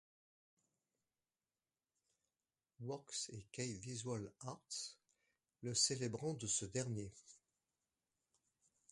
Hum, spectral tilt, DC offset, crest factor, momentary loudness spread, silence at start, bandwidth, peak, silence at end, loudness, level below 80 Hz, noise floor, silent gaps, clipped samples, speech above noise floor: none; -3 dB/octave; under 0.1%; 24 dB; 15 LU; 2.8 s; 11.5 kHz; -24 dBFS; 1.55 s; -43 LUFS; -76 dBFS; under -90 dBFS; none; under 0.1%; over 46 dB